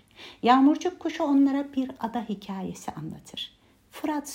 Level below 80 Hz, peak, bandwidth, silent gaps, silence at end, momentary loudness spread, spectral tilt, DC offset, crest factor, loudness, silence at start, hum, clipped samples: -66 dBFS; -6 dBFS; 16 kHz; none; 0 s; 17 LU; -5 dB/octave; under 0.1%; 20 dB; -26 LUFS; 0.2 s; none; under 0.1%